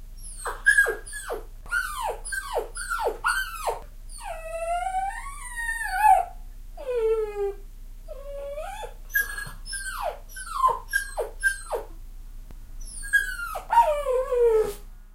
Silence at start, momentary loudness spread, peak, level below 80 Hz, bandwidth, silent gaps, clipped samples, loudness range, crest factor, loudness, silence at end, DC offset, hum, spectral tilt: 0 s; 18 LU; -6 dBFS; -40 dBFS; 16 kHz; none; under 0.1%; 5 LU; 20 dB; -26 LUFS; 0 s; under 0.1%; none; -2 dB/octave